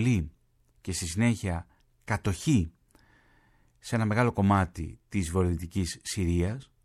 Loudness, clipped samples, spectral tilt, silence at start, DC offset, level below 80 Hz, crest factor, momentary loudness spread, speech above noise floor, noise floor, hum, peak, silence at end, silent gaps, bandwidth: -29 LUFS; under 0.1%; -6 dB/octave; 0 s; under 0.1%; -46 dBFS; 18 dB; 13 LU; 36 dB; -63 dBFS; none; -12 dBFS; 0.2 s; none; 14 kHz